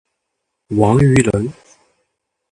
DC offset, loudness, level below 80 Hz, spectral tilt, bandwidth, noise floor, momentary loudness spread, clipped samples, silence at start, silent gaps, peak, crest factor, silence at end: under 0.1%; -14 LUFS; -40 dBFS; -7 dB/octave; 11 kHz; -75 dBFS; 11 LU; under 0.1%; 0.7 s; none; 0 dBFS; 18 dB; 1 s